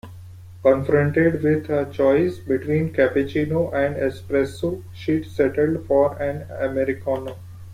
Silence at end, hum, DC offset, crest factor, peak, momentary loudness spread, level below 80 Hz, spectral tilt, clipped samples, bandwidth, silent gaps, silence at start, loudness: 0 s; none; under 0.1%; 18 dB; -4 dBFS; 9 LU; -50 dBFS; -8 dB/octave; under 0.1%; 15 kHz; none; 0.05 s; -21 LUFS